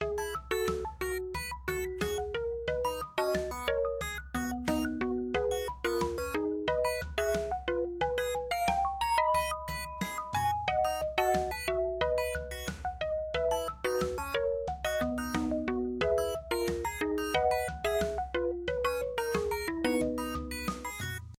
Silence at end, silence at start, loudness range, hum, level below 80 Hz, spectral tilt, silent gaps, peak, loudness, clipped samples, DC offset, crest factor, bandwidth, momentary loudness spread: 0.05 s; 0 s; 2 LU; none; -46 dBFS; -4.5 dB/octave; none; -14 dBFS; -32 LUFS; under 0.1%; under 0.1%; 18 dB; 16.5 kHz; 6 LU